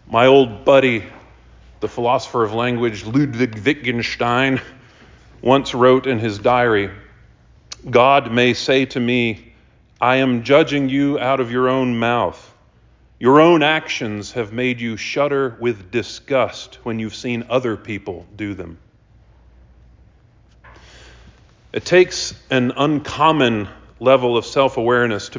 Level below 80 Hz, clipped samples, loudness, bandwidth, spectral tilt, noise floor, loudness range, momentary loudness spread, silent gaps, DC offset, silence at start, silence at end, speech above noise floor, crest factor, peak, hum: -48 dBFS; under 0.1%; -17 LUFS; 7.6 kHz; -5.5 dB/octave; -52 dBFS; 9 LU; 14 LU; none; under 0.1%; 0.1 s; 0 s; 35 dB; 18 dB; -2 dBFS; none